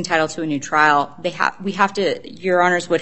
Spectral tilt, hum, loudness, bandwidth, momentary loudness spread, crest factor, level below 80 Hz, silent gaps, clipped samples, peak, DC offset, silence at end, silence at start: -4 dB/octave; none; -19 LUFS; 8.8 kHz; 8 LU; 18 dB; -60 dBFS; none; under 0.1%; 0 dBFS; 0.7%; 0 s; 0 s